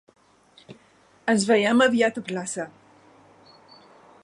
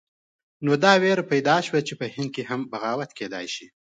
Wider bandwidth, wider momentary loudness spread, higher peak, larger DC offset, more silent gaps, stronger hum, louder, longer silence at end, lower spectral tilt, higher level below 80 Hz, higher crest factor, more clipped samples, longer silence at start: first, 11.5 kHz vs 9.2 kHz; about the same, 14 LU vs 14 LU; about the same, -6 dBFS vs -4 dBFS; neither; neither; neither; about the same, -22 LUFS vs -23 LUFS; first, 1.55 s vs 0.3 s; about the same, -4 dB/octave vs -5 dB/octave; about the same, -72 dBFS vs -72 dBFS; about the same, 20 dB vs 22 dB; neither; about the same, 0.7 s vs 0.6 s